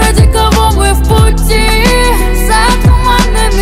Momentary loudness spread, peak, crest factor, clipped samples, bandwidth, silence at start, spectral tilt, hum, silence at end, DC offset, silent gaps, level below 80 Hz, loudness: 2 LU; 0 dBFS; 6 dB; 0.2%; 16 kHz; 0 s; -4.5 dB/octave; none; 0 s; under 0.1%; none; -10 dBFS; -9 LUFS